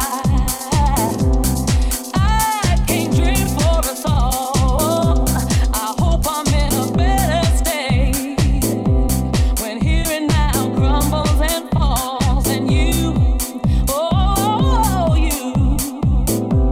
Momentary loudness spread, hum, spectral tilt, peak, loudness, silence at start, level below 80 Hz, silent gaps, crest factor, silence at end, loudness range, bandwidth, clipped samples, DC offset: 3 LU; none; -5 dB/octave; -2 dBFS; -17 LUFS; 0 s; -20 dBFS; none; 12 dB; 0 s; 1 LU; 16.5 kHz; under 0.1%; under 0.1%